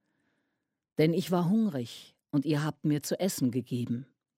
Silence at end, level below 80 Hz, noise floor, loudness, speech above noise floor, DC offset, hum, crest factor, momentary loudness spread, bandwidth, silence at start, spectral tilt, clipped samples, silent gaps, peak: 0.35 s; -76 dBFS; -83 dBFS; -30 LUFS; 54 dB; under 0.1%; none; 18 dB; 11 LU; 16 kHz; 1 s; -6 dB/octave; under 0.1%; none; -12 dBFS